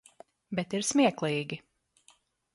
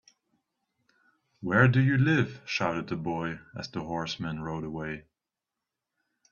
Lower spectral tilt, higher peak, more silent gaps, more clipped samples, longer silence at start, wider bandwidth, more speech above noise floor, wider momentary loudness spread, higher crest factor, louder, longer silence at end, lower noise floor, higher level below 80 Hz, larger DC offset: second, -4 dB/octave vs -7 dB/octave; second, -12 dBFS vs -6 dBFS; neither; neither; second, 0.5 s vs 1.4 s; first, 11.5 kHz vs 7 kHz; second, 37 dB vs 61 dB; second, 13 LU vs 16 LU; about the same, 20 dB vs 24 dB; about the same, -29 LUFS vs -28 LUFS; second, 0.95 s vs 1.3 s; second, -65 dBFS vs -88 dBFS; second, -72 dBFS vs -60 dBFS; neither